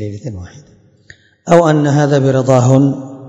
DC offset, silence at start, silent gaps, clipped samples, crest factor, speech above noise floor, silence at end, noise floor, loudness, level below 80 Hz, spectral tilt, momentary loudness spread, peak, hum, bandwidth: under 0.1%; 0 s; none; 0.6%; 14 dB; 33 dB; 0 s; -45 dBFS; -11 LUFS; -52 dBFS; -7.5 dB/octave; 18 LU; 0 dBFS; none; 8.6 kHz